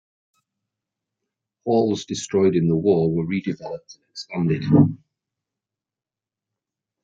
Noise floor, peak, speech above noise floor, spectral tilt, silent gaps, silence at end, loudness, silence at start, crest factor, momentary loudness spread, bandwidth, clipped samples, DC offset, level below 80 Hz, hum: -90 dBFS; -4 dBFS; 69 dB; -7 dB/octave; none; 2.1 s; -21 LUFS; 1.65 s; 20 dB; 18 LU; 7.8 kHz; under 0.1%; under 0.1%; -58 dBFS; none